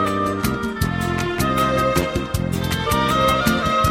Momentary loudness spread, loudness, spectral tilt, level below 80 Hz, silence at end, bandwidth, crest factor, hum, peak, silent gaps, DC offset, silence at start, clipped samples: 6 LU; -20 LUFS; -5 dB/octave; -34 dBFS; 0 s; 16.5 kHz; 14 dB; none; -4 dBFS; none; 0.1%; 0 s; under 0.1%